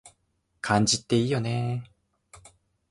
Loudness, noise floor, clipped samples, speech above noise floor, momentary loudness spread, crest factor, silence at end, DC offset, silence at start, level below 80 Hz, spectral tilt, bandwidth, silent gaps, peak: -26 LUFS; -73 dBFS; under 0.1%; 48 dB; 12 LU; 20 dB; 0.55 s; under 0.1%; 0.05 s; -58 dBFS; -4.5 dB/octave; 11.5 kHz; none; -8 dBFS